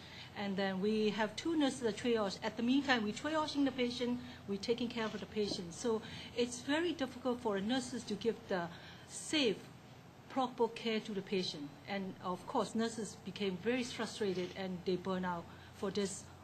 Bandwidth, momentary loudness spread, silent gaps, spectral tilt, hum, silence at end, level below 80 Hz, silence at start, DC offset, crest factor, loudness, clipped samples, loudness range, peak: 15 kHz; 9 LU; none; -4.5 dB/octave; none; 0 s; -68 dBFS; 0 s; under 0.1%; 22 dB; -38 LUFS; under 0.1%; 4 LU; -16 dBFS